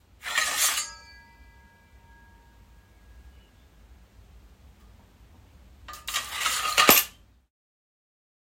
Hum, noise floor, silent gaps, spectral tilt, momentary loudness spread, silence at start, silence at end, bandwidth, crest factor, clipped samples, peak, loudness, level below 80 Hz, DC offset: none; -55 dBFS; none; 0 dB/octave; 21 LU; 0.25 s; 1.4 s; 16.5 kHz; 30 dB; under 0.1%; 0 dBFS; -23 LUFS; -56 dBFS; under 0.1%